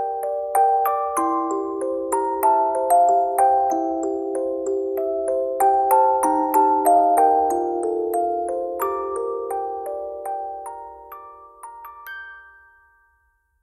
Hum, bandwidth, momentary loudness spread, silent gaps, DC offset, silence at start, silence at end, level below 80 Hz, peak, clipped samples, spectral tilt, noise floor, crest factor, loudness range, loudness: none; 15.5 kHz; 19 LU; none; under 0.1%; 0 s; 1.2 s; -60 dBFS; -6 dBFS; under 0.1%; -4.5 dB/octave; -65 dBFS; 16 dB; 14 LU; -21 LUFS